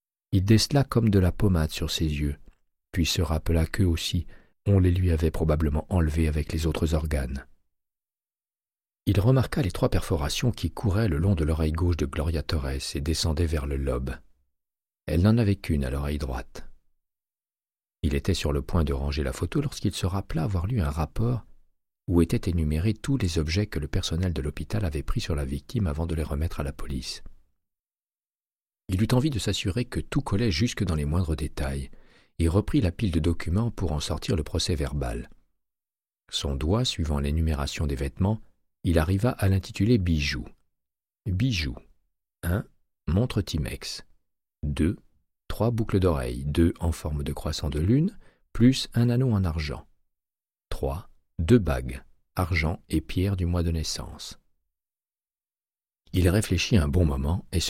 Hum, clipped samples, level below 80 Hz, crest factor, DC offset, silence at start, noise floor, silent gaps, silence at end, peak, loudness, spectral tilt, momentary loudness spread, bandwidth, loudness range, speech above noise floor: none; under 0.1%; -34 dBFS; 20 dB; under 0.1%; 0.3 s; under -90 dBFS; 28.35-28.39 s; 0 s; -6 dBFS; -27 LUFS; -6 dB/octave; 11 LU; 15.5 kHz; 5 LU; over 65 dB